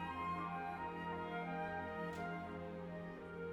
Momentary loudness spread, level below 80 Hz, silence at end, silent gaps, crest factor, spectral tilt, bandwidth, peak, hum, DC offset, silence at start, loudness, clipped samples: 6 LU; -68 dBFS; 0 s; none; 12 dB; -7 dB/octave; 12 kHz; -32 dBFS; none; under 0.1%; 0 s; -45 LUFS; under 0.1%